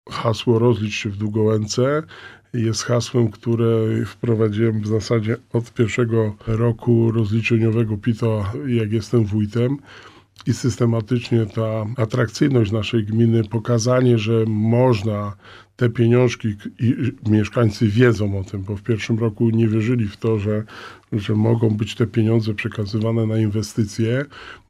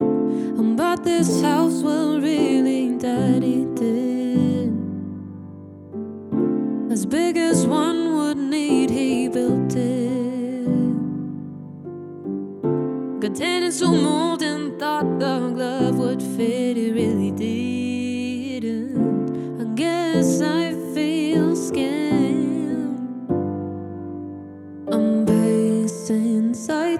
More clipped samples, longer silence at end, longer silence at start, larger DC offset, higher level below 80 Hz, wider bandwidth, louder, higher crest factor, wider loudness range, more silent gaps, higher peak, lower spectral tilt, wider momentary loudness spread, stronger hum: neither; about the same, 0.1 s vs 0 s; about the same, 0.05 s vs 0 s; neither; first, -52 dBFS vs -62 dBFS; second, 11 kHz vs 14.5 kHz; about the same, -20 LUFS vs -21 LUFS; about the same, 16 dB vs 16 dB; about the same, 3 LU vs 4 LU; neither; first, -2 dBFS vs -6 dBFS; about the same, -7 dB/octave vs -6 dB/octave; second, 8 LU vs 13 LU; neither